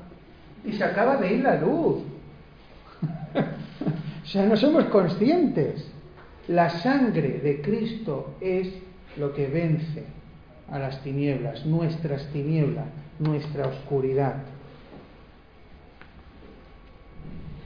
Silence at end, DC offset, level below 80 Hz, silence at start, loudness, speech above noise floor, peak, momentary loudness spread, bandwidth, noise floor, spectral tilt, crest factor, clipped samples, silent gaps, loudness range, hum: 0 s; under 0.1%; -52 dBFS; 0 s; -25 LUFS; 26 dB; -6 dBFS; 21 LU; 5.2 kHz; -50 dBFS; -9 dB/octave; 20 dB; under 0.1%; none; 7 LU; none